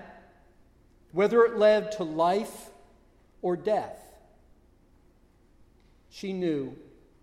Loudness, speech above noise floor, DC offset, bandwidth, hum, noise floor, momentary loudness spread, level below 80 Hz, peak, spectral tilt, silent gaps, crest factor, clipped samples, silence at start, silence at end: -27 LUFS; 35 dB; under 0.1%; 15 kHz; none; -61 dBFS; 19 LU; -62 dBFS; -10 dBFS; -6 dB/octave; none; 20 dB; under 0.1%; 0 s; 0.4 s